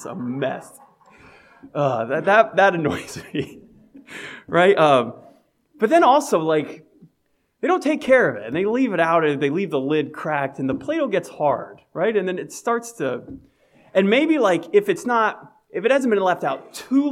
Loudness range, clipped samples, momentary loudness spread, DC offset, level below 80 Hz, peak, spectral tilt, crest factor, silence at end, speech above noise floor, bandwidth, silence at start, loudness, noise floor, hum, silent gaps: 4 LU; under 0.1%; 14 LU; under 0.1%; -62 dBFS; -2 dBFS; -5.5 dB/octave; 20 dB; 0 s; 48 dB; 15.5 kHz; 0 s; -20 LUFS; -68 dBFS; none; none